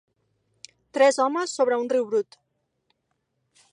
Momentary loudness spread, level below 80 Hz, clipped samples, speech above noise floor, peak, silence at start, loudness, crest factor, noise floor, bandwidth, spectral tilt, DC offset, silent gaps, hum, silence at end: 11 LU; -80 dBFS; under 0.1%; 53 dB; -8 dBFS; 0.95 s; -23 LUFS; 20 dB; -76 dBFS; 11 kHz; -2.5 dB/octave; under 0.1%; none; none; 1.5 s